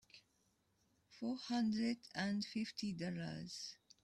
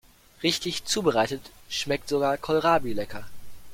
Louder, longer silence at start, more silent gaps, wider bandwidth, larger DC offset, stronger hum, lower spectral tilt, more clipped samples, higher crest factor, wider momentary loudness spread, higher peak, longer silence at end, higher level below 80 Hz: second, -43 LUFS vs -26 LUFS; second, 0.15 s vs 0.4 s; neither; second, 12 kHz vs 16.5 kHz; neither; neither; first, -5 dB/octave vs -3.5 dB/octave; neither; about the same, 18 dB vs 20 dB; about the same, 9 LU vs 11 LU; second, -26 dBFS vs -6 dBFS; first, 0.3 s vs 0 s; second, -78 dBFS vs -52 dBFS